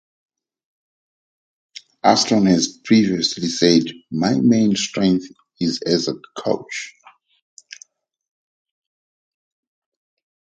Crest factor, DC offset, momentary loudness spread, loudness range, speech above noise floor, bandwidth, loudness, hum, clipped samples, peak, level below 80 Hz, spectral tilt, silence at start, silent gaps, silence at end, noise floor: 20 dB; under 0.1%; 12 LU; 13 LU; 33 dB; 9.2 kHz; -18 LUFS; none; under 0.1%; 0 dBFS; -58 dBFS; -4.5 dB/octave; 2.05 s; none; 3.55 s; -51 dBFS